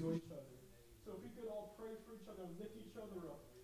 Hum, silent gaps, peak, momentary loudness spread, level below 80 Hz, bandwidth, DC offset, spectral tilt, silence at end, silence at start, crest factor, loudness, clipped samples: none; none; -30 dBFS; 11 LU; -72 dBFS; 16 kHz; under 0.1%; -7 dB/octave; 0 s; 0 s; 20 dB; -52 LUFS; under 0.1%